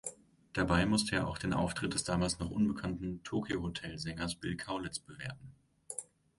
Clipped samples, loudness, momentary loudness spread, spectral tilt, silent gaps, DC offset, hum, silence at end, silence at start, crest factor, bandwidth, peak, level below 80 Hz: under 0.1%; -36 LUFS; 13 LU; -4.5 dB/octave; none; under 0.1%; none; 0.35 s; 0.05 s; 20 dB; 11.5 kHz; -16 dBFS; -52 dBFS